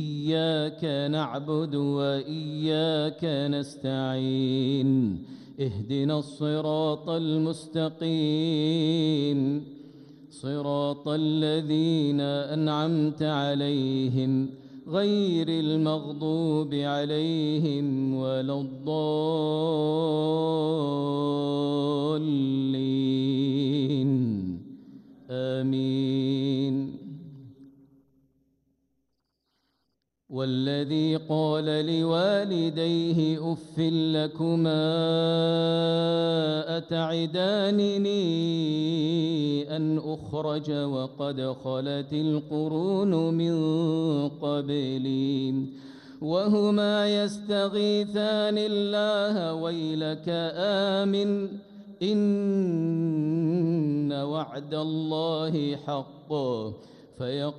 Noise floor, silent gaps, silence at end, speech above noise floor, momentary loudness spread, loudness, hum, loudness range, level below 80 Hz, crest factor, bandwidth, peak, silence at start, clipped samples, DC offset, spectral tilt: -79 dBFS; none; 0 s; 53 dB; 7 LU; -27 LUFS; none; 4 LU; -70 dBFS; 14 dB; 10.5 kHz; -14 dBFS; 0 s; under 0.1%; under 0.1%; -7.5 dB/octave